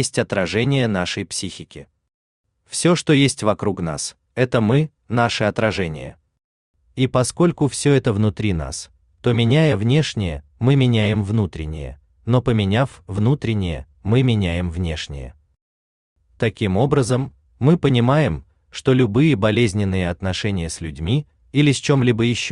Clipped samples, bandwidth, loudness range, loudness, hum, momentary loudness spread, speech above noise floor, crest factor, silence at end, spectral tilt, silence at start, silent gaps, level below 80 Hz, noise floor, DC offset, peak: under 0.1%; 11 kHz; 4 LU; -19 LUFS; none; 13 LU; over 72 dB; 18 dB; 0 s; -6 dB/octave; 0 s; 2.14-2.44 s, 6.44-6.74 s, 15.62-16.16 s; -42 dBFS; under -90 dBFS; under 0.1%; -2 dBFS